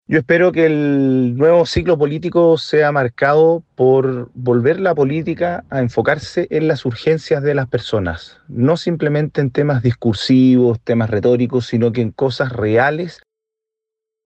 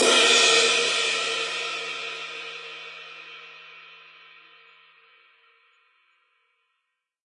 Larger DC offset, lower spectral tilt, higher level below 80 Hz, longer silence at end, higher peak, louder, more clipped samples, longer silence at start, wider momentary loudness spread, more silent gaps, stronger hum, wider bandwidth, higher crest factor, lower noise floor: neither; first, -7.5 dB/octave vs 1 dB/octave; first, -46 dBFS vs under -90 dBFS; second, 1.15 s vs 3.3 s; first, -2 dBFS vs -6 dBFS; first, -16 LUFS vs -20 LUFS; neither; about the same, 0.1 s vs 0 s; second, 7 LU vs 26 LU; neither; neither; second, 8.4 kHz vs 11.5 kHz; second, 12 dB vs 22 dB; about the same, -83 dBFS vs -80 dBFS